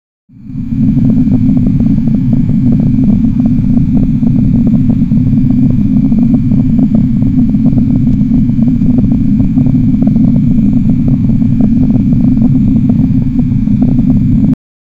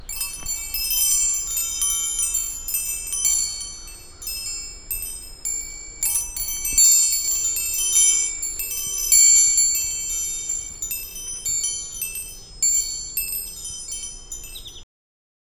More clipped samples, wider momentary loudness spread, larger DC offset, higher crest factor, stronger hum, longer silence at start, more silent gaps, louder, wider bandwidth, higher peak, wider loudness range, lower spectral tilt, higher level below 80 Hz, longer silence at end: neither; second, 2 LU vs 18 LU; neither; second, 8 dB vs 20 dB; neither; first, 0.4 s vs 0 s; neither; first, -9 LUFS vs -19 LUFS; second, 4.6 kHz vs over 20 kHz; about the same, 0 dBFS vs -2 dBFS; second, 1 LU vs 9 LU; first, -11.5 dB/octave vs 2 dB/octave; first, -20 dBFS vs -42 dBFS; second, 0.45 s vs 0.65 s